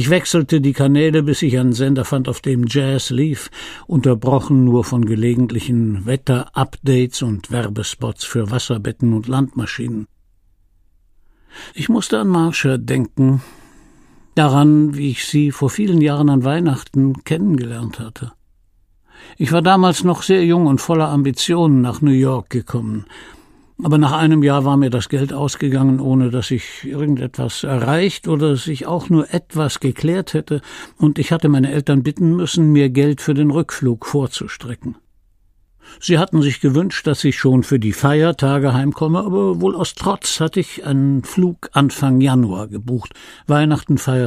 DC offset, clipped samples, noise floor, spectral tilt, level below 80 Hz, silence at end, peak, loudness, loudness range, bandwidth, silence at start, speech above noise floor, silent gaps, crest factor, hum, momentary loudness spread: under 0.1%; under 0.1%; -55 dBFS; -6.5 dB/octave; -48 dBFS; 0 s; 0 dBFS; -16 LUFS; 5 LU; 15 kHz; 0 s; 39 dB; none; 16 dB; none; 10 LU